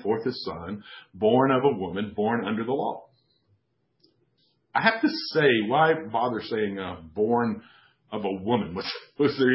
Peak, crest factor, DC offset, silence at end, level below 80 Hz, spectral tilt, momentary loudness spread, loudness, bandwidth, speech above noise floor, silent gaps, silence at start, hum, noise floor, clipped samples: -4 dBFS; 22 dB; under 0.1%; 0 s; -60 dBFS; -9.5 dB/octave; 14 LU; -25 LUFS; 5.8 kHz; 46 dB; none; 0 s; none; -71 dBFS; under 0.1%